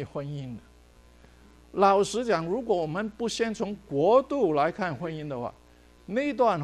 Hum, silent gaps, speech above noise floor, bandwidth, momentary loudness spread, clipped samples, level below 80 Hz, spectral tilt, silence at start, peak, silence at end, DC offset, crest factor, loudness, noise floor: none; none; 29 dB; 12.5 kHz; 14 LU; under 0.1%; -58 dBFS; -5.5 dB/octave; 0 s; -8 dBFS; 0 s; under 0.1%; 20 dB; -27 LUFS; -55 dBFS